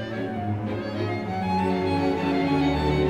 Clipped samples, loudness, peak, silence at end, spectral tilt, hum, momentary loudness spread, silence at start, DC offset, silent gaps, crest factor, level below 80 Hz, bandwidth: under 0.1%; -25 LUFS; -12 dBFS; 0 s; -7.5 dB/octave; none; 6 LU; 0 s; 0.1%; none; 14 dB; -40 dBFS; 10.5 kHz